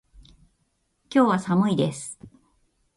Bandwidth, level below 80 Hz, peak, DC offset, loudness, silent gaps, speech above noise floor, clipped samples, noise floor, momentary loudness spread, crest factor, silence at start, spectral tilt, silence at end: 11.5 kHz; -60 dBFS; -8 dBFS; under 0.1%; -22 LUFS; none; 49 dB; under 0.1%; -71 dBFS; 17 LU; 18 dB; 1.1 s; -6 dB/octave; 0.7 s